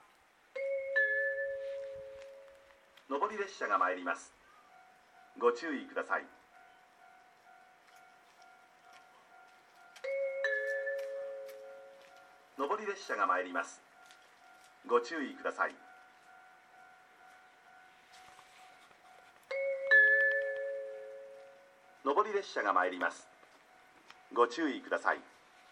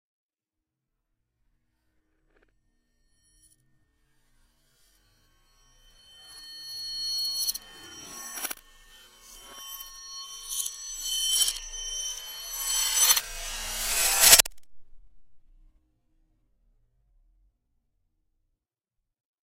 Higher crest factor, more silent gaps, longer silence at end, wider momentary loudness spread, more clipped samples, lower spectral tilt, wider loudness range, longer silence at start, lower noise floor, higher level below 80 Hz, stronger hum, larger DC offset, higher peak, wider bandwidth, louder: second, 24 dB vs 32 dB; neither; second, 0.45 s vs 4.15 s; about the same, 22 LU vs 23 LU; neither; first, -2.5 dB/octave vs 2 dB/octave; second, 12 LU vs 15 LU; second, 0.55 s vs 6.2 s; second, -66 dBFS vs -88 dBFS; second, -86 dBFS vs -52 dBFS; neither; neither; second, -14 dBFS vs 0 dBFS; second, 13.5 kHz vs 16 kHz; second, -33 LUFS vs -24 LUFS